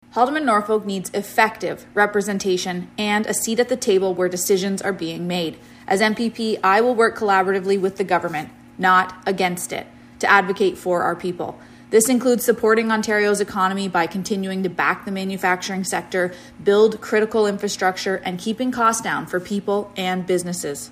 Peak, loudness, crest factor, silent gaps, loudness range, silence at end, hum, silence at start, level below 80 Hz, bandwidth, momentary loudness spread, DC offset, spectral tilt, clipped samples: 0 dBFS; -20 LUFS; 20 dB; none; 2 LU; 0 s; none; 0.15 s; -58 dBFS; 15.5 kHz; 9 LU; under 0.1%; -4 dB/octave; under 0.1%